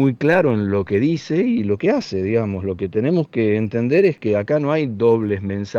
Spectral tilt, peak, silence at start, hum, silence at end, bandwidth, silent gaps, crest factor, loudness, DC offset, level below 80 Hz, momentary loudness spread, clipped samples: -8 dB/octave; -4 dBFS; 0 s; none; 0 s; 7.4 kHz; none; 14 dB; -19 LUFS; under 0.1%; -54 dBFS; 5 LU; under 0.1%